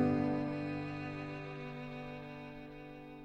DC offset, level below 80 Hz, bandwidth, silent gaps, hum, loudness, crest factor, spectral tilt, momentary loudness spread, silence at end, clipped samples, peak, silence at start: under 0.1%; -62 dBFS; 8 kHz; none; none; -41 LUFS; 18 dB; -8.5 dB/octave; 15 LU; 0 s; under 0.1%; -20 dBFS; 0 s